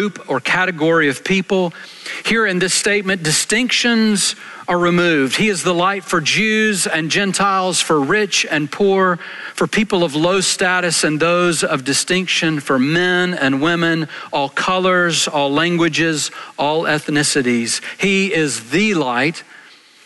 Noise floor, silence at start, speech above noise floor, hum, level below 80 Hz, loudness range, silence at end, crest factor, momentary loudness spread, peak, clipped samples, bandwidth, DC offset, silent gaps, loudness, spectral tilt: -44 dBFS; 0 s; 27 dB; none; -54 dBFS; 1 LU; 0.65 s; 12 dB; 6 LU; -4 dBFS; under 0.1%; 12.5 kHz; under 0.1%; none; -16 LUFS; -3.5 dB/octave